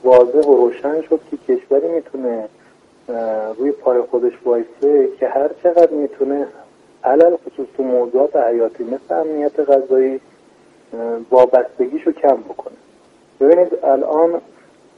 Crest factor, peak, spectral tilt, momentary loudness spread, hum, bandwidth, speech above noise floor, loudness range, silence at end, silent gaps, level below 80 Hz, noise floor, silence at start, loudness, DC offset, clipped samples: 16 dB; 0 dBFS; -7 dB/octave; 12 LU; none; 5.8 kHz; 34 dB; 4 LU; 0.6 s; none; -64 dBFS; -50 dBFS; 0.05 s; -16 LUFS; under 0.1%; under 0.1%